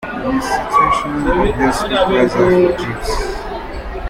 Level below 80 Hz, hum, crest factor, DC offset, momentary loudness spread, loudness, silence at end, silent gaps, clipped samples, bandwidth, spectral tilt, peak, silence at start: -28 dBFS; none; 14 dB; under 0.1%; 12 LU; -15 LUFS; 0 s; none; under 0.1%; 16 kHz; -5.5 dB/octave; -2 dBFS; 0 s